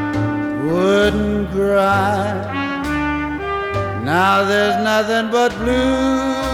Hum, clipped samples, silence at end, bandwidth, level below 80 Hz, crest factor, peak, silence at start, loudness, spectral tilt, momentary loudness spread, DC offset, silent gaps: none; under 0.1%; 0 s; 16.5 kHz; -36 dBFS; 14 dB; -4 dBFS; 0 s; -17 LUFS; -5.5 dB/octave; 7 LU; under 0.1%; none